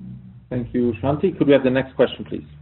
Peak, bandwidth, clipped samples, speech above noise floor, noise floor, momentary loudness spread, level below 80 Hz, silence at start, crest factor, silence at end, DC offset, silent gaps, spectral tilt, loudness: -2 dBFS; 4.2 kHz; under 0.1%; 19 dB; -38 dBFS; 14 LU; -48 dBFS; 0 s; 18 dB; 0.05 s; under 0.1%; none; -6 dB/octave; -20 LUFS